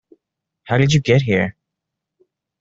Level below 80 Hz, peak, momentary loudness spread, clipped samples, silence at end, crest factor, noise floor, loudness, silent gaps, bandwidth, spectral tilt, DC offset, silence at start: -50 dBFS; -2 dBFS; 7 LU; under 0.1%; 1.1 s; 18 dB; -81 dBFS; -17 LUFS; none; 7.8 kHz; -6 dB/octave; under 0.1%; 0.65 s